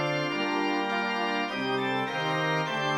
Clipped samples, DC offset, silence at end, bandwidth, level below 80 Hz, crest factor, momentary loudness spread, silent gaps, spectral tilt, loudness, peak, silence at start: under 0.1%; under 0.1%; 0 s; 17 kHz; -72 dBFS; 14 dB; 1 LU; none; -5 dB/octave; -28 LUFS; -16 dBFS; 0 s